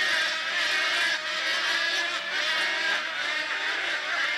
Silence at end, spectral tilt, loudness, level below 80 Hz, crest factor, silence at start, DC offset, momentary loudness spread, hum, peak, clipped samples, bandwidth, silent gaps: 0 s; 1 dB/octave; -25 LUFS; -76 dBFS; 12 dB; 0 s; under 0.1%; 4 LU; none; -14 dBFS; under 0.1%; 13 kHz; none